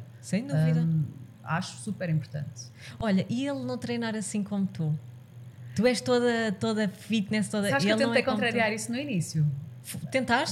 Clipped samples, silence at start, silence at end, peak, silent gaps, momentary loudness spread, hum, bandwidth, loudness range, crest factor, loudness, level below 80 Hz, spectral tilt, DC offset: under 0.1%; 0 s; 0 s; -10 dBFS; none; 14 LU; none; 14 kHz; 5 LU; 18 dB; -28 LUFS; -62 dBFS; -5.5 dB/octave; under 0.1%